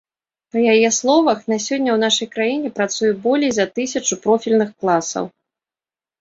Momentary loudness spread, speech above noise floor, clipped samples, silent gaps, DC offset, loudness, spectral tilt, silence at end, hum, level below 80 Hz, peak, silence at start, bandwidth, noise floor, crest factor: 7 LU; over 73 dB; under 0.1%; none; under 0.1%; -18 LUFS; -3 dB/octave; 0.9 s; none; -62 dBFS; -2 dBFS; 0.55 s; 8 kHz; under -90 dBFS; 16 dB